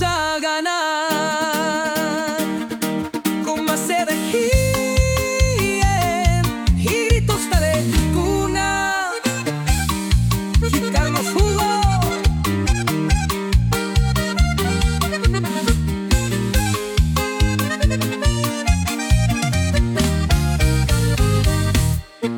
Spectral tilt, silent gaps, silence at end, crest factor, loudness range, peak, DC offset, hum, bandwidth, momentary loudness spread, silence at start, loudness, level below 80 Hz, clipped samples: -5 dB/octave; none; 0 s; 16 dB; 2 LU; -2 dBFS; under 0.1%; none; over 20 kHz; 3 LU; 0 s; -19 LUFS; -24 dBFS; under 0.1%